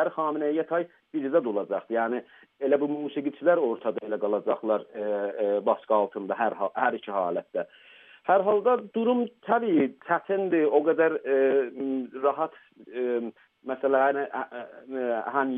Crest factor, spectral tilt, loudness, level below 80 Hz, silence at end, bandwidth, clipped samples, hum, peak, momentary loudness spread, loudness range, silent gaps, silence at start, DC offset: 18 dB; -9.5 dB/octave; -27 LUFS; -86 dBFS; 0 s; 3.8 kHz; under 0.1%; none; -8 dBFS; 10 LU; 4 LU; none; 0 s; under 0.1%